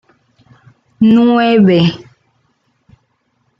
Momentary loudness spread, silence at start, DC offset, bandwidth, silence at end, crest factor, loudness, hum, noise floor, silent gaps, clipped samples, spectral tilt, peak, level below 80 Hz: 7 LU; 1 s; under 0.1%; 6.2 kHz; 1.65 s; 12 dB; -10 LUFS; none; -62 dBFS; none; under 0.1%; -8.5 dB/octave; -2 dBFS; -54 dBFS